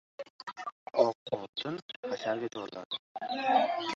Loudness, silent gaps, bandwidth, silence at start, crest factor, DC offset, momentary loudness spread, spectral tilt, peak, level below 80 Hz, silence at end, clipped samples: -33 LUFS; 0.30-0.39 s, 0.72-0.86 s, 1.15-1.26 s, 1.49-1.53 s, 1.82-1.89 s, 1.96-2.03 s, 2.85-2.90 s, 2.99-3.15 s; 7.8 kHz; 0.2 s; 24 dB; under 0.1%; 14 LU; -4.5 dB/octave; -10 dBFS; -80 dBFS; 0 s; under 0.1%